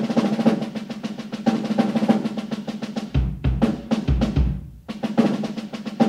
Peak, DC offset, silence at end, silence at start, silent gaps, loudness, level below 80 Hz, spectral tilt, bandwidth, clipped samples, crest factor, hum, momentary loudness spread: -6 dBFS; under 0.1%; 0 s; 0 s; none; -23 LUFS; -32 dBFS; -7.5 dB/octave; 11 kHz; under 0.1%; 18 dB; none; 10 LU